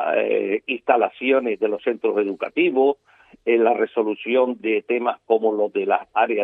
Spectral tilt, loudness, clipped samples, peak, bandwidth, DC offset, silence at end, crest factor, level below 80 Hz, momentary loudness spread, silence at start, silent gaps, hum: -7.5 dB/octave; -21 LUFS; under 0.1%; -2 dBFS; 3.9 kHz; under 0.1%; 0 s; 18 dB; -72 dBFS; 5 LU; 0 s; none; none